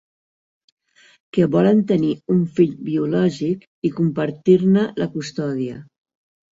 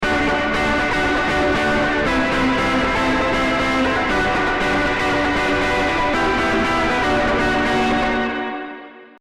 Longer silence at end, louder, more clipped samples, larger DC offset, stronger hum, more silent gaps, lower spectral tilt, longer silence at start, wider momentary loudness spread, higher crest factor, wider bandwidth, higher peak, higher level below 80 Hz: first, 0.75 s vs 0.15 s; about the same, -19 LUFS vs -18 LUFS; neither; neither; neither; first, 3.67-3.82 s vs none; first, -8 dB/octave vs -4.5 dB/octave; first, 1.35 s vs 0 s; first, 10 LU vs 1 LU; first, 18 dB vs 8 dB; second, 7.8 kHz vs 13.5 kHz; first, -2 dBFS vs -10 dBFS; second, -60 dBFS vs -34 dBFS